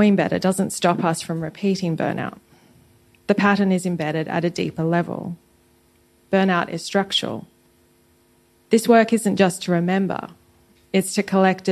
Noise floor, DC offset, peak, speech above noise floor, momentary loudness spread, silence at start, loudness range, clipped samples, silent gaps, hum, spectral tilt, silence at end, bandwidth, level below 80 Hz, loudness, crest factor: -58 dBFS; under 0.1%; -2 dBFS; 38 dB; 12 LU; 0 s; 3 LU; under 0.1%; none; none; -5.5 dB/octave; 0 s; 13 kHz; -62 dBFS; -21 LUFS; 18 dB